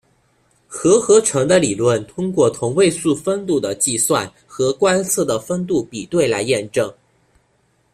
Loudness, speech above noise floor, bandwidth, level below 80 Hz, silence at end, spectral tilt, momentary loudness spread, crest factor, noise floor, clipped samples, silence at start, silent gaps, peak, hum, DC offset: -17 LUFS; 44 dB; 15.5 kHz; -54 dBFS; 1 s; -4 dB/octave; 8 LU; 16 dB; -61 dBFS; under 0.1%; 0.7 s; none; -2 dBFS; none; under 0.1%